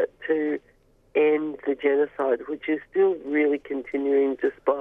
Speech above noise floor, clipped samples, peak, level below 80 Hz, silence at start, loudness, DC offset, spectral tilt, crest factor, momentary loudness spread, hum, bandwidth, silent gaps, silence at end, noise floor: 36 dB; under 0.1%; -10 dBFS; -64 dBFS; 0 s; -25 LUFS; under 0.1%; -7.5 dB/octave; 16 dB; 6 LU; none; 3.8 kHz; none; 0 s; -60 dBFS